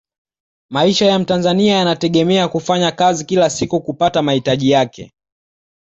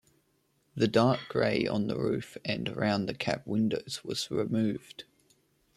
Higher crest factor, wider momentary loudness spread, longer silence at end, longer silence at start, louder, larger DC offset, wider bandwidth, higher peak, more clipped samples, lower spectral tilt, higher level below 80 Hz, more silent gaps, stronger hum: second, 14 dB vs 20 dB; second, 4 LU vs 9 LU; about the same, 0.8 s vs 0.75 s; about the same, 0.7 s vs 0.75 s; first, -15 LUFS vs -30 LUFS; neither; second, 8 kHz vs 13.5 kHz; first, -2 dBFS vs -10 dBFS; neither; about the same, -5 dB/octave vs -6 dB/octave; first, -52 dBFS vs -64 dBFS; neither; neither